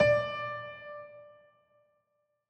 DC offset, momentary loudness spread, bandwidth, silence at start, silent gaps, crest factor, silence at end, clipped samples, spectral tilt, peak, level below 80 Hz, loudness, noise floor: under 0.1%; 22 LU; 8.4 kHz; 0 s; none; 22 dB; 1.2 s; under 0.1%; -6 dB/octave; -12 dBFS; -62 dBFS; -33 LUFS; -79 dBFS